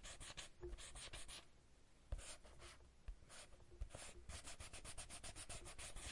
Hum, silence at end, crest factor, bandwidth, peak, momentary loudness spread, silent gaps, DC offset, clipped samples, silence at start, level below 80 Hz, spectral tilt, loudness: none; 0 s; 20 dB; 11.5 kHz; -36 dBFS; 9 LU; none; under 0.1%; under 0.1%; 0 s; -60 dBFS; -2.5 dB/octave; -56 LUFS